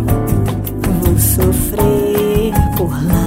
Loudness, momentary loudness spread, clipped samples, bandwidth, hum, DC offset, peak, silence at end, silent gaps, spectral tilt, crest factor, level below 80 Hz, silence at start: -14 LUFS; 5 LU; under 0.1%; 16.5 kHz; none; under 0.1%; 0 dBFS; 0 s; none; -6.5 dB/octave; 12 dB; -22 dBFS; 0 s